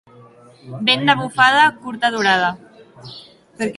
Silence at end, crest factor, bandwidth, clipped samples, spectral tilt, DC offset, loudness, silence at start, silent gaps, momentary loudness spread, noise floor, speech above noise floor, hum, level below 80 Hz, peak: 0.05 s; 18 dB; 11.5 kHz; under 0.1%; -3.5 dB/octave; under 0.1%; -16 LUFS; 0.65 s; none; 24 LU; -45 dBFS; 28 dB; none; -60 dBFS; 0 dBFS